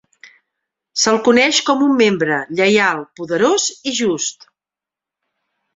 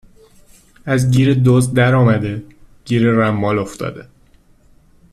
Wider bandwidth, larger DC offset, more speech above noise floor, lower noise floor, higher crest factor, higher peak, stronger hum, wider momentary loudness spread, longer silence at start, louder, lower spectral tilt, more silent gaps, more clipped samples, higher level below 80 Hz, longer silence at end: second, 8.2 kHz vs 13 kHz; neither; first, 72 dB vs 36 dB; first, -88 dBFS vs -50 dBFS; about the same, 16 dB vs 14 dB; about the same, 0 dBFS vs -2 dBFS; first, 50 Hz at -45 dBFS vs none; second, 10 LU vs 14 LU; about the same, 0.95 s vs 0.85 s; about the same, -15 LUFS vs -15 LUFS; second, -2.5 dB/octave vs -7 dB/octave; neither; neither; second, -62 dBFS vs -44 dBFS; first, 1.45 s vs 1.1 s